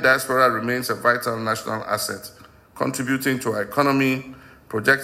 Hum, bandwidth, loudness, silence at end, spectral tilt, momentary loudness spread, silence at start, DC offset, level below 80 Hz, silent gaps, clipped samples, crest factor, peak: none; 16 kHz; -22 LUFS; 0 s; -4.5 dB/octave; 10 LU; 0 s; under 0.1%; -60 dBFS; none; under 0.1%; 18 dB; -4 dBFS